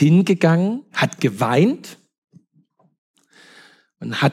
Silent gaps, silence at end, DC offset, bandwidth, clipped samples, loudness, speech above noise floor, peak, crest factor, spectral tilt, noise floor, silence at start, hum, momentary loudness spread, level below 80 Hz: 2.18-2.22 s, 2.98-3.14 s; 0 s; under 0.1%; 14 kHz; under 0.1%; -18 LUFS; 43 dB; -2 dBFS; 18 dB; -6.5 dB/octave; -60 dBFS; 0 s; none; 15 LU; -72 dBFS